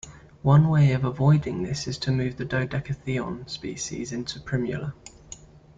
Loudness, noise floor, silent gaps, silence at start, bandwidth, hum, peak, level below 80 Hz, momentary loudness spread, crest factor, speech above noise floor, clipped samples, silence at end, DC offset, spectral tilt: -25 LUFS; -46 dBFS; none; 0.05 s; 7.8 kHz; none; -8 dBFS; -50 dBFS; 21 LU; 18 dB; 22 dB; under 0.1%; 0.4 s; under 0.1%; -6.5 dB/octave